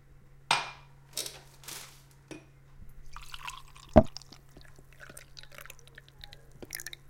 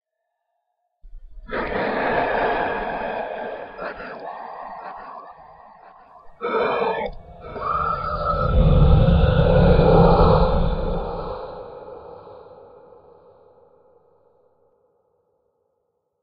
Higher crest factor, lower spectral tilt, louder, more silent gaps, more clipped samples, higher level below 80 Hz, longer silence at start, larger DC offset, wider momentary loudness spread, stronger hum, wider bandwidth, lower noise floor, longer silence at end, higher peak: first, 34 dB vs 20 dB; second, -4.5 dB/octave vs -11 dB/octave; second, -31 LUFS vs -20 LUFS; neither; neither; second, -46 dBFS vs -28 dBFS; second, 0.1 s vs 1.05 s; neither; first, 28 LU vs 22 LU; neither; first, 17 kHz vs 5.4 kHz; second, -55 dBFS vs -77 dBFS; second, 0.15 s vs 3.85 s; about the same, -2 dBFS vs -2 dBFS